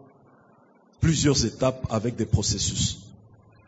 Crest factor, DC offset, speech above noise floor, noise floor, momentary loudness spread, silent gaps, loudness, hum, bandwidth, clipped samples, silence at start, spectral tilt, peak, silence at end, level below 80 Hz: 18 dB; under 0.1%; 34 dB; -58 dBFS; 7 LU; none; -24 LUFS; none; 8 kHz; under 0.1%; 1 s; -4.5 dB/octave; -8 dBFS; 0.6 s; -44 dBFS